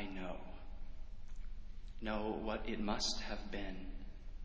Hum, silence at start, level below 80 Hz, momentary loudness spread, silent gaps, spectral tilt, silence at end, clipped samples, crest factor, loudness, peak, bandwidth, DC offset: none; 0 s; -48 dBFS; 18 LU; none; -4 dB/octave; 0 s; under 0.1%; 18 dB; -42 LUFS; -22 dBFS; 8 kHz; under 0.1%